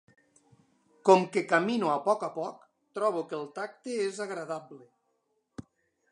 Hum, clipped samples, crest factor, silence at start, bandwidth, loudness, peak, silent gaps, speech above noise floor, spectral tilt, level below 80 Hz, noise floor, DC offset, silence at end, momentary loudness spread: none; under 0.1%; 24 dB; 1.05 s; 11 kHz; -29 LUFS; -6 dBFS; none; 48 dB; -5 dB/octave; -76 dBFS; -76 dBFS; under 0.1%; 0.5 s; 20 LU